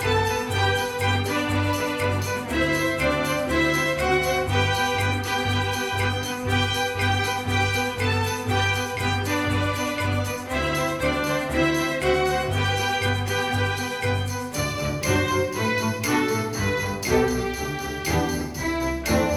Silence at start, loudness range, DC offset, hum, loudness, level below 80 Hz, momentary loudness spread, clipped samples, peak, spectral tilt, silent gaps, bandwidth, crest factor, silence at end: 0 s; 2 LU; under 0.1%; none; -23 LUFS; -40 dBFS; 4 LU; under 0.1%; -8 dBFS; -4.5 dB/octave; none; over 20 kHz; 16 dB; 0 s